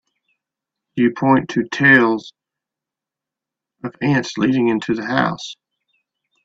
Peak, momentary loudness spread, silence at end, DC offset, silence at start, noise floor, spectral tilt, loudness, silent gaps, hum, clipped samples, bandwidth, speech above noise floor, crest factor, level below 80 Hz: 0 dBFS; 18 LU; 0.9 s; under 0.1%; 0.95 s; -86 dBFS; -6 dB/octave; -17 LUFS; none; none; under 0.1%; 7.8 kHz; 70 dB; 20 dB; -60 dBFS